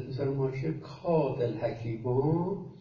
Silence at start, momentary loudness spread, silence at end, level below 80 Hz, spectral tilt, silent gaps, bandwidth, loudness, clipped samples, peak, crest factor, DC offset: 0 s; 7 LU; 0 s; -58 dBFS; -10 dB/octave; none; 7 kHz; -31 LUFS; under 0.1%; -14 dBFS; 16 dB; under 0.1%